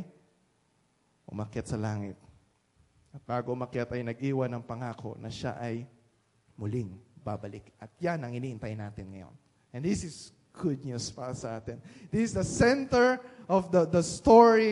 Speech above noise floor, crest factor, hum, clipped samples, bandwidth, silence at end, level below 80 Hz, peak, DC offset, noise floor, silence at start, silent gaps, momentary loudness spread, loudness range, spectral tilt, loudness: 42 dB; 24 dB; none; under 0.1%; 11.5 kHz; 0 s; -56 dBFS; -6 dBFS; under 0.1%; -71 dBFS; 0 s; none; 19 LU; 10 LU; -6 dB/octave; -29 LUFS